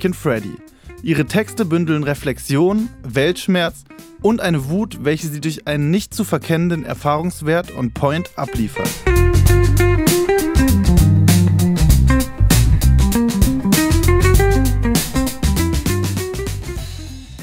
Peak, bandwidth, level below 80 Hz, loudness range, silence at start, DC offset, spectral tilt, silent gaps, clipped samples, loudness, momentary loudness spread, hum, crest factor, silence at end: -2 dBFS; 16.5 kHz; -22 dBFS; 5 LU; 0 s; under 0.1%; -5.5 dB/octave; none; under 0.1%; -17 LUFS; 9 LU; none; 14 dB; 0 s